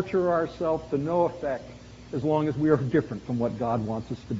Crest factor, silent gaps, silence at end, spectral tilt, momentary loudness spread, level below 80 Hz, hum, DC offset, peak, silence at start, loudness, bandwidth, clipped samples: 18 dB; none; 0 s; -7.5 dB/octave; 10 LU; -52 dBFS; none; under 0.1%; -8 dBFS; 0 s; -27 LUFS; 7.6 kHz; under 0.1%